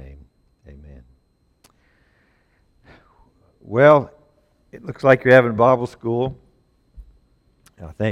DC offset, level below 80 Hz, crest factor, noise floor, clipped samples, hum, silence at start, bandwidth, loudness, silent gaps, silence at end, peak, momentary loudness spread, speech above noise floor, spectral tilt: under 0.1%; -50 dBFS; 20 dB; -62 dBFS; under 0.1%; none; 3.7 s; 10 kHz; -16 LUFS; none; 0 s; 0 dBFS; 24 LU; 46 dB; -8 dB/octave